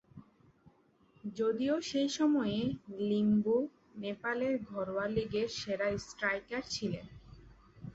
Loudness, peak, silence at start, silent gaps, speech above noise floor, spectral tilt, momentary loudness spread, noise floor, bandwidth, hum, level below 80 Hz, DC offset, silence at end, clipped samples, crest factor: -34 LUFS; -16 dBFS; 0.15 s; none; 34 dB; -5.5 dB/octave; 12 LU; -67 dBFS; 8 kHz; none; -62 dBFS; under 0.1%; 0.05 s; under 0.1%; 18 dB